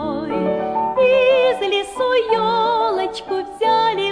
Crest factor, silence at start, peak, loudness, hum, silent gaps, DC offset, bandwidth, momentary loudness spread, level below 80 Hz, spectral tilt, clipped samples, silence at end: 12 dB; 0 s; -6 dBFS; -18 LUFS; none; none; under 0.1%; 10.5 kHz; 9 LU; -52 dBFS; -4.5 dB/octave; under 0.1%; 0 s